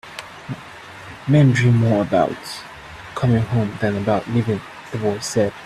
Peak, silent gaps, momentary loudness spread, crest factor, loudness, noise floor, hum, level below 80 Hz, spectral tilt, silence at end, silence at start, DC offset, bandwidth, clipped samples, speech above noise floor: -4 dBFS; none; 19 LU; 16 dB; -19 LUFS; -38 dBFS; none; -50 dBFS; -7 dB/octave; 0 s; 0.05 s; under 0.1%; 13 kHz; under 0.1%; 20 dB